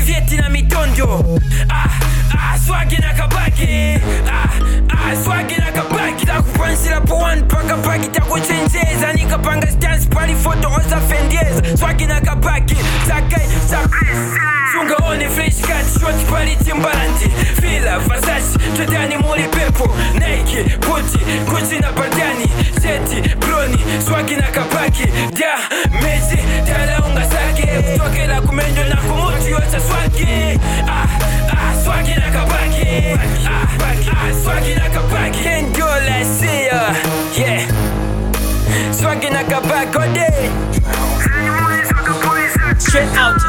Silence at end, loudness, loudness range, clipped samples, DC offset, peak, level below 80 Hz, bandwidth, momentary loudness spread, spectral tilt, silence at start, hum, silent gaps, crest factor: 0 s; -15 LUFS; 1 LU; under 0.1%; under 0.1%; 0 dBFS; -16 dBFS; 17.5 kHz; 2 LU; -4.5 dB/octave; 0 s; none; none; 14 dB